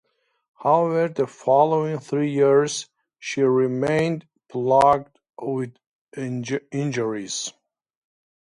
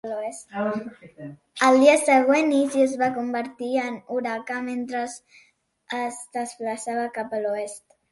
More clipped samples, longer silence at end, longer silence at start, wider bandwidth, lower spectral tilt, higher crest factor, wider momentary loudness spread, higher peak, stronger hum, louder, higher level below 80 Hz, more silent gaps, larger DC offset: neither; first, 0.95 s vs 0.35 s; first, 0.6 s vs 0.05 s; about the same, 11.5 kHz vs 11.5 kHz; first, -5.5 dB/octave vs -3.5 dB/octave; about the same, 18 dB vs 20 dB; second, 15 LU vs 18 LU; about the same, -4 dBFS vs -4 dBFS; neither; about the same, -22 LUFS vs -23 LUFS; first, -62 dBFS vs -72 dBFS; first, 5.87-6.12 s vs none; neither